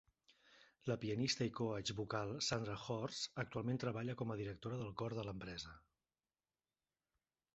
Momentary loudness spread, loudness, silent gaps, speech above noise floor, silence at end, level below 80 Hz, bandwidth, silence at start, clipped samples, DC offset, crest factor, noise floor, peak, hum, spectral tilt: 8 LU; -43 LUFS; none; over 47 dB; 1.75 s; -70 dBFS; 8 kHz; 0.5 s; under 0.1%; under 0.1%; 20 dB; under -90 dBFS; -24 dBFS; none; -4.5 dB/octave